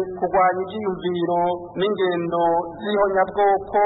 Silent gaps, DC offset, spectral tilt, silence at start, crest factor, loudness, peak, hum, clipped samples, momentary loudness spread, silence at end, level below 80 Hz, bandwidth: none; under 0.1%; -10.5 dB/octave; 0 s; 14 dB; -21 LUFS; -8 dBFS; none; under 0.1%; 6 LU; 0 s; -52 dBFS; 4.1 kHz